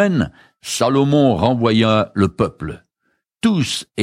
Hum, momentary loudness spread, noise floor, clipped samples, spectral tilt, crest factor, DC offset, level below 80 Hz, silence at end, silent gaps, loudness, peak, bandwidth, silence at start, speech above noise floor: none; 15 LU; -69 dBFS; under 0.1%; -5.5 dB/octave; 16 dB; under 0.1%; -44 dBFS; 0 s; none; -17 LUFS; -2 dBFS; 15.5 kHz; 0 s; 53 dB